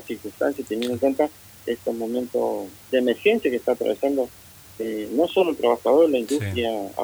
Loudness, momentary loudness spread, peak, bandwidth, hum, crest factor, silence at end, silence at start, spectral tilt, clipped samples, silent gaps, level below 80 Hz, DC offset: -23 LUFS; 11 LU; -6 dBFS; over 20 kHz; none; 18 dB; 0 s; 0 s; -5.5 dB/octave; under 0.1%; none; -60 dBFS; under 0.1%